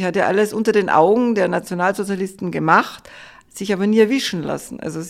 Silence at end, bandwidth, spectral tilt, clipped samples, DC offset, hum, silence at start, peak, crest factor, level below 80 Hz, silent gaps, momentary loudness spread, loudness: 0 s; 15 kHz; -5.5 dB/octave; under 0.1%; under 0.1%; none; 0 s; 0 dBFS; 18 dB; -58 dBFS; none; 13 LU; -18 LUFS